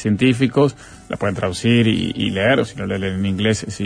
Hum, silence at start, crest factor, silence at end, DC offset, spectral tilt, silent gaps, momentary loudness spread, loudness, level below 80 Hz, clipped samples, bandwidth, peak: none; 0 s; 14 dB; 0 s; under 0.1%; -6 dB/octave; none; 8 LU; -18 LUFS; -46 dBFS; under 0.1%; 10.5 kHz; -4 dBFS